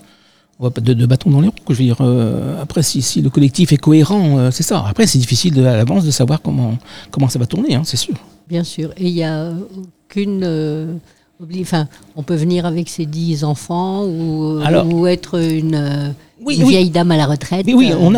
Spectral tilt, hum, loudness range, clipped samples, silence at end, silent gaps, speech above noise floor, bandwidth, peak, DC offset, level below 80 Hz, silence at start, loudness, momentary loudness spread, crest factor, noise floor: -6 dB/octave; none; 8 LU; under 0.1%; 0 s; none; 37 dB; 16 kHz; 0 dBFS; 0.6%; -46 dBFS; 0.6 s; -15 LUFS; 12 LU; 14 dB; -51 dBFS